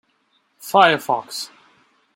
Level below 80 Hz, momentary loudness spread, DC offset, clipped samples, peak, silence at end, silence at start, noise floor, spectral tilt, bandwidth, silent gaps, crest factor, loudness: -72 dBFS; 20 LU; under 0.1%; under 0.1%; -2 dBFS; 0.7 s; 0.65 s; -65 dBFS; -3 dB/octave; 16.5 kHz; none; 20 dB; -18 LUFS